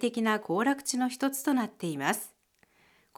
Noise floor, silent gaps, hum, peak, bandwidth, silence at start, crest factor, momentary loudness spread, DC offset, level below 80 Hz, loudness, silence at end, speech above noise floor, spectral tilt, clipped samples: -67 dBFS; none; none; -12 dBFS; 18.5 kHz; 0 s; 20 dB; 6 LU; under 0.1%; -80 dBFS; -30 LUFS; 0.9 s; 38 dB; -3.5 dB/octave; under 0.1%